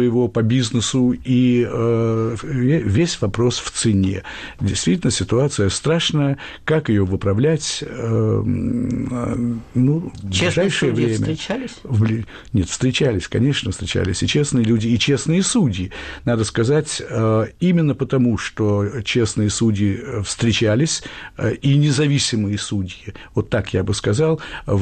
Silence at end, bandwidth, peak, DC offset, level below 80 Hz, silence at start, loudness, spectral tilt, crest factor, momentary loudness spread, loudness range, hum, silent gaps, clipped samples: 0 s; 9.4 kHz; -8 dBFS; under 0.1%; -42 dBFS; 0 s; -19 LUFS; -5.5 dB/octave; 12 dB; 7 LU; 2 LU; none; none; under 0.1%